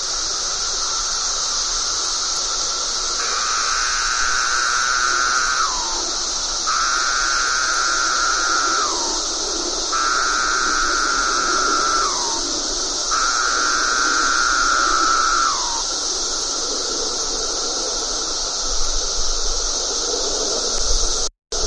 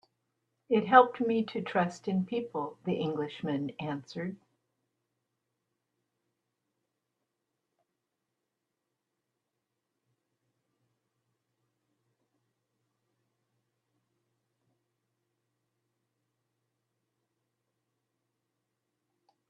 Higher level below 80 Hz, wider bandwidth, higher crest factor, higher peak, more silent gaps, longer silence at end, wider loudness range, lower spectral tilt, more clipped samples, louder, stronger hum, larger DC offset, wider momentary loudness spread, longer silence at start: first, -34 dBFS vs -80 dBFS; first, 11.5 kHz vs 8.8 kHz; second, 16 dB vs 32 dB; about the same, -4 dBFS vs -6 dBFS; neither; second, 0 s vs 15.15 s; second, 3 LU vs 16 LU; second, 0.5 dB/octave vs -7 dB/octave; neither; first, -18 LUFS vs -30 LUFS; neither; neither; second, 4 LU vs 15 LU; second, 0 s vs 0.7 s